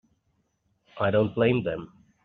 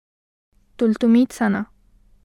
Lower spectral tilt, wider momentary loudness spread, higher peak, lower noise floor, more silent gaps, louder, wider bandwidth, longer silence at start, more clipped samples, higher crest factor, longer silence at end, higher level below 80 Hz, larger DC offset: about the same, -6 dB/octave vs -6.5 dB/octave; about the same, 10 LU vs 10 LU; about the same, -8 dBFS vs -8 dBFS; first, -72 dBFS vs -54 dBFS; neither; second, -25 LUFS vs -19 LUFS; second, 4.7 kHz vs 12 kHz; first, 0.95 s vs 0.8 s; neither; first, 20 dB vs 14 dB; second, 0.4 s vs 0.6 s; about the same, -60 dBFS vs -56 dBFS; neither